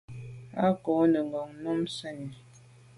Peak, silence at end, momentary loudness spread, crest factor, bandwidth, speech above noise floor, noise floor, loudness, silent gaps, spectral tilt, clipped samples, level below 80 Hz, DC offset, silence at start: -12 dBFS; 0.6 s; 18 LU; 18 dB; 11.5 kHz; 26 dB; -54 dBFS; -29 LUFS; none; -7 dB/octave; under 0.1%; -66 dBFS; under 0.1%; 0.1 s